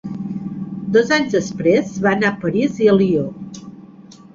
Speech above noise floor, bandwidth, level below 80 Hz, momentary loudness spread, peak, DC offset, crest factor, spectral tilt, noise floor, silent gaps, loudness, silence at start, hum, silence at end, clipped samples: 25 dB; 7.6 kHz; -54 dBFS; 13 LU; -2 dBFS; under 0.1%; 16 dB; -6 dB/octave; -42 dBFS; none; -18 LUFS; 0.05 s; none; 0.35 s; under 0.1%